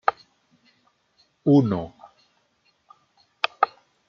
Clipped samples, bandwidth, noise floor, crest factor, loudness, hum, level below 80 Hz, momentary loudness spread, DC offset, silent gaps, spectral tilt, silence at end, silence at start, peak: under 0.1%; 6.4 kHz; -67 dBFS; 26 dB; -23 LUFS; none; -66 dBFS; 10 LU; under 0.1%; none; -8 dB/octave; 0.4 s; 0.1 s; -2 dBFS